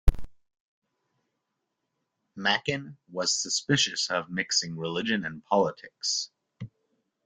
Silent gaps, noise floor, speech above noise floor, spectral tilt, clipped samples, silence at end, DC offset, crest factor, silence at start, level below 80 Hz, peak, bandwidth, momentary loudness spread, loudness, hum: 0.60-0.82 s; -82 dBFS; 53 dB; -2.5 dB/octave; under 0.1%; 0.6 s; under 0.1%; 24 dB; 0.05 s; -36 dBFS; -6 dBFS; 11 kHz; 16 LU; -27 LUFS; none